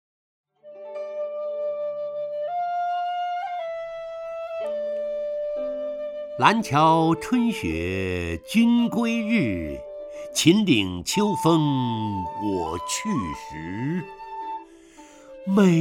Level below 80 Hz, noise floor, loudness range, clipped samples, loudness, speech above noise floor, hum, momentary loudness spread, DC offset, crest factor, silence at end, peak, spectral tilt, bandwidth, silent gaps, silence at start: -52 dBFS; -48 dBFS; 8 LU; under 0.1%; -24 LUFS; 26 dB; none; 15 LU; under 0.1%; 22 dB; 0 s; -2 dBFS; -5.5 dB/octave; 16 kHz; none; 0.65 s